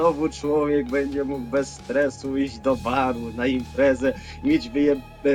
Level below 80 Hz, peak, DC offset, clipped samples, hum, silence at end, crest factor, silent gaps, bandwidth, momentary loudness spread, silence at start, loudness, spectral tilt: -44 dBFS; -8 dBFS; under 0.1%; under 0.1%; none; 0 s; 16 dB; none; 11.5 kHz; 5 LU; 0 s; -24 LUFS; -6 dB/octave